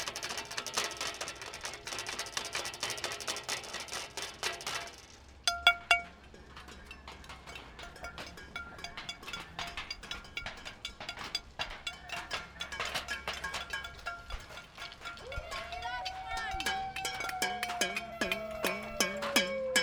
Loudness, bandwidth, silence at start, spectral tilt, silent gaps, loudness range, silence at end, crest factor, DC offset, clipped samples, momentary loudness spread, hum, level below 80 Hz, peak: -36 LUFS; over 20 kHz; 0 s; -1 dB/octave; none; 9 LU; 0 s; 30 dB; under 0.1%; under 0.1%; 16 LU; none; -56 dBFS; -8 dBFS